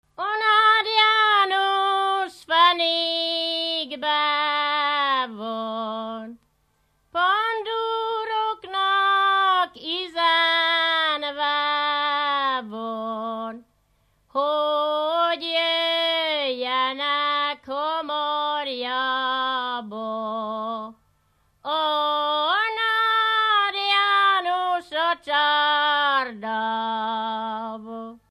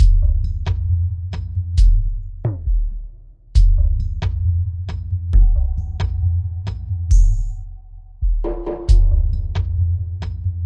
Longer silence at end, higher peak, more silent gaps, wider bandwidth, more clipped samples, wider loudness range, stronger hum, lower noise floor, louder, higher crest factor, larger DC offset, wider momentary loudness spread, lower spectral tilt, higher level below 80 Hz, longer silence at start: first, 0.15 s vs 0 s; about the same, -4 dBFS vs -2 dBFS; neither; first, 12.5 kHz vs 7.2 kHz; neither; first, 6 LU vs 2 LU; neither; first, -67 dBFS vs -38 dBFS; about the same, -22 LUFS vs -21 LUFS; about the same, 18 dB vs 14 dB; neither; about the same, 11 LU vs 10 LU; second, -2.5 dB/octave vs -7.5 dB/octave; second, -70 dBFS vs -18 dBFS; first, 0.2 s vs 0 s